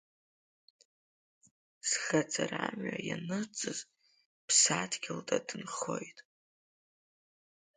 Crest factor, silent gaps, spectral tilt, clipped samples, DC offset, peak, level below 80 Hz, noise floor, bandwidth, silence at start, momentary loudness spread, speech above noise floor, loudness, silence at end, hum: 26 dB; 4.25-4.48 s; -2 dB/octave; under 0.1%; under 0.1%; -12 dBFS; -80 dBFS; under -90 dBFS; 9.4 kHz; 1.85 s; 14 LU; over 56 dB; -33 LUFS; 1.55 s; none